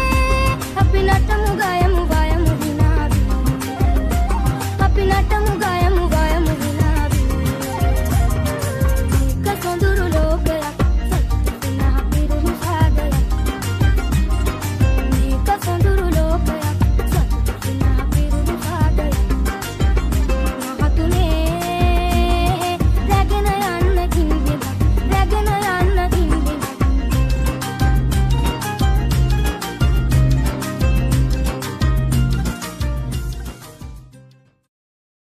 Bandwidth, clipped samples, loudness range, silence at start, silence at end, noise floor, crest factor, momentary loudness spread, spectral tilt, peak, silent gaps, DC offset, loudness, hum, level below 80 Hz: 15.5 kHz; under 0.1%; 2 LU; 0 s; 1.05 s; -48 dBFS; 14 dB; 5 LU; -6 dB/octave; -2 dBFS; none; under 0.1%; -18 LUFS; none; -18 dBFS